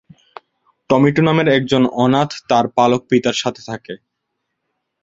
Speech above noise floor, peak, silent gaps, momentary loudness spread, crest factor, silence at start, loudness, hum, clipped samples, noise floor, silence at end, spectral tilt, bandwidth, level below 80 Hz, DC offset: 60 dB; 0 dBFS; none; 16 LU; 16 dB; 0.9 s; -15 LUFS; none; under 0.1%; -75 dBFS; 1.05 s; -6 dB/octave; 7.8 kHz; -54 dBFS; under 0.1%